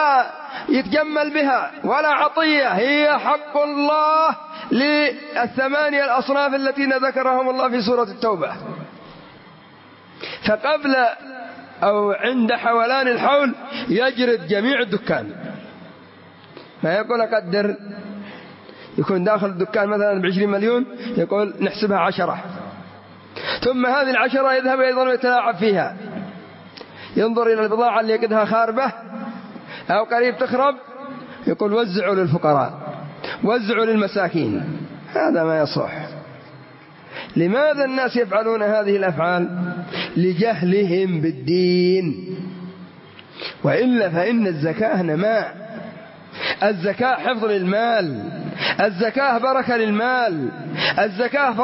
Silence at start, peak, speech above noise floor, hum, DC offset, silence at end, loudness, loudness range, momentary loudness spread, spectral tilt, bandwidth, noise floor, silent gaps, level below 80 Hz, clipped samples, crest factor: 0 s; -4 dBFS; 26 dB; none; under 0.1%; 0 s; -19 LUFS; 4 LU; 16 LU; -9.5 dB/octave; 5.8 kHz; -45 dBFS; none; -62 dBFS; under 0.1%; 16 dB